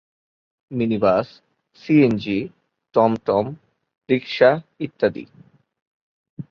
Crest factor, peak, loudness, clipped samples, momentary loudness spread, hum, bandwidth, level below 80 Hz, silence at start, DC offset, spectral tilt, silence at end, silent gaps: 20 dB; -2 dBFS; -20 LUFS; under 0.1%; 18 LU; none; 6.8 kHz; -58 dBFS; 0.7 s; under 0.1%; -8 dB/octave; 0.1 s; 5.82-6.37 s